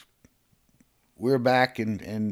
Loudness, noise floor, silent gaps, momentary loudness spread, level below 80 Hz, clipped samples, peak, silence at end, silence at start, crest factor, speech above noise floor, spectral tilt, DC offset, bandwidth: -25 LUFS; -66 dBFS; none; 9 LU; -64 dBFS; under 0.1%; -8 dBFS; 0 s; 1.2 s; 20 dB; 42 dB; -6.5 dB/octave; under 0.1%; 16 kHz